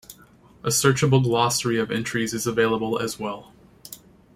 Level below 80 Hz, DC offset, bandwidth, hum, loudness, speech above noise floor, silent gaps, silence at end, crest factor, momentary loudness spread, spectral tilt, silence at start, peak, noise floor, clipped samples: -56 dBFS; under 0.1%; 16.5 kHz; none; -22 LUFS; 30 dB; none; 0.4 s; 20 dB; 21 LU; -4.5 dB/octave; 0.1 s; -4 dBFS; -52 dBFS; under 0.1%